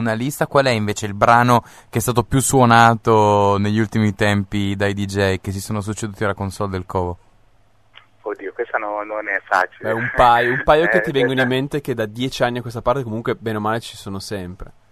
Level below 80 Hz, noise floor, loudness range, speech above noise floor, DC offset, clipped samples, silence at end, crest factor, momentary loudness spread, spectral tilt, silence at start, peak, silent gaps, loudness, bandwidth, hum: -44 dBFS; -57 dBFS; 10 LU; 39 dB; 0.2%; under 0.1%; 0.25 s; 18 dB; 13 LU; -5 dB/octave; 0 s; 0 dBFS; none; -18 LUFS; 13.5 kHz; none